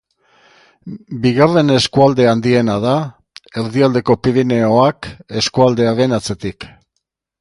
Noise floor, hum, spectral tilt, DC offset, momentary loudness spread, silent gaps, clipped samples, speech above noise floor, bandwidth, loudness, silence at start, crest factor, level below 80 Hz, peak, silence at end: -73 dBFS; none; -6 dB/octave; under 0.1%; 17 LU; none; under 0.1%; 59 dB; 11.5 kHz; -14 LUFS; 0.85 s; 16 dB; -46 dBFS; 0 dBFS; 0.75 s